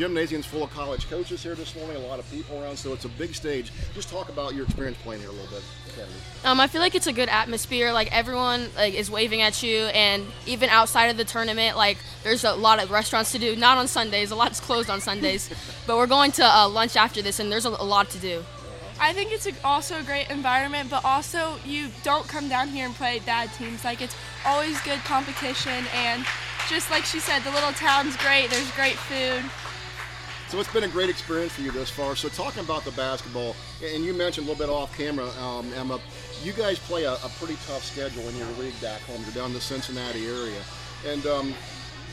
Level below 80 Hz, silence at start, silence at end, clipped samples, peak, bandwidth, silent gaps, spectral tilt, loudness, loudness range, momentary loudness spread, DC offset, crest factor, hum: -46 dBFS; 0 s; 0 s; under 0.1%; -2 dBFS; 16 kHz; none; -3 dB/octave; -24 LUFS; 11 LU; 15 LU; under 0.1%; 24 dB; none